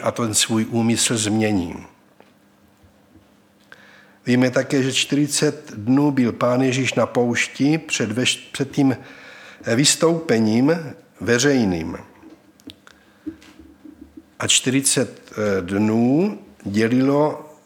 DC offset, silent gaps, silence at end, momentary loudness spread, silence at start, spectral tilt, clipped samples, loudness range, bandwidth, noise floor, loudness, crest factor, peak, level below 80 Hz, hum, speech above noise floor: under 0.1%; none; 0.15 s; 15 LU; 0 s; -4 dB/octave; under 0.1%; 6 LU; 17.5 kHz; -55 dBFS; -19 LUFS; 18 dB; -2 dBFS; -58 dBFS; none; 36 dB